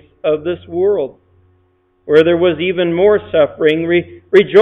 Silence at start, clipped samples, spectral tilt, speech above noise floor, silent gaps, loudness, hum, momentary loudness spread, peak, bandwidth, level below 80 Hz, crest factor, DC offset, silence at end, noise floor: 0.25 s; under 0.1%; -7.5 dB/octave; 45 dB; none; -14 LUFS; none; 8 LU; 0 dBFS; 5.8 kHz; -52 dBFS; 14 dB; under 0.1%; 0 s; -57 dBFS